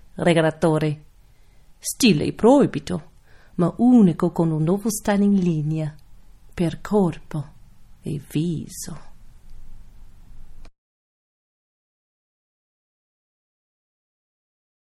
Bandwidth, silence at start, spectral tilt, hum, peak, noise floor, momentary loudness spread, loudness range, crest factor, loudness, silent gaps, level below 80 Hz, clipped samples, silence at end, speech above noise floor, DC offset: 14.5 kHz; 0.15 s; -6 dB/octave; none; -2 dBFS; -50 dBFS; 18 LU; 13 LU; 20 dB; -21 LUFS; none; -46 dBFS; under 0.1%; 4.15 s; 30 dB; under 0.1%